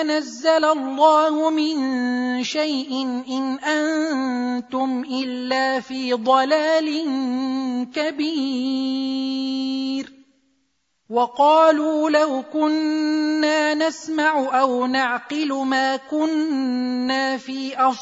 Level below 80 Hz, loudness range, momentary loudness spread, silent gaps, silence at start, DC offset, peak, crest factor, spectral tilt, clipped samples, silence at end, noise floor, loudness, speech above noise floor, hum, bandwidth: -74 dBFS; 5 LU; 8 LU; none; 0 s; under 0.1%; -4 dBFS; 16 dB; -3 dB/octave; under 0.1%; 0 s; -70 dBFS; -21 LUFS; 50 dB; none; 8 kHz